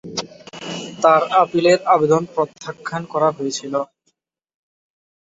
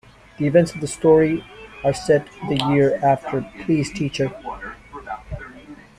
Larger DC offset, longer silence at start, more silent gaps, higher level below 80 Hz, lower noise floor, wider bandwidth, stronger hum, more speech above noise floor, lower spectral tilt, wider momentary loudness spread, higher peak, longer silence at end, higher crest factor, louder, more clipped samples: neither; second, 0.05 s vs 0.4 s; neither; second, -64 dBFS vs -46 dBFS; first, -69 dBFS vs -42 dBFS; second, 8 kHz vs 12 kHz; neither; first, 52 dB vs 23 dB; second, -4.5 dB/octave vs -6 dB/octave; second, 15 LU vs 19 LU; about the same, 0 dBFS vs -2 dBFS; first, 1.35 s vs 0.25 s; about the same, 18 dB vs 18 dB; about the same, -18 LUFS vs -20 LUFS; neither